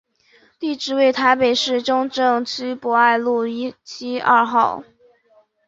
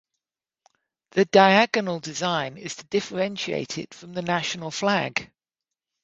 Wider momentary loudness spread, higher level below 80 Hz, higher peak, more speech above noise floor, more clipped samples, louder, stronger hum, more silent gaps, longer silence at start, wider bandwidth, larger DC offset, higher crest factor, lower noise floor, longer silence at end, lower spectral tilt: second, 12 LU vs 15 LU; about the same, -64 dBFS vs -66 dBFS; about the same, -2 dBFS vs -2 dBFS; second, 39 dB vs 65 dB; neither; first, -18 LUFS vs -23 LUFS; neither; neither; second, 0.6 s vs 1.15 s; about the same, 8 kHz vs 8 kHz; neither; second, 18 dB vs 24 dB; second, -57 dBFS vs -88 dBFS; about the same, 0.85 s vs 0.8 s; about the same, -3 dB/octave vs -4 dB/octave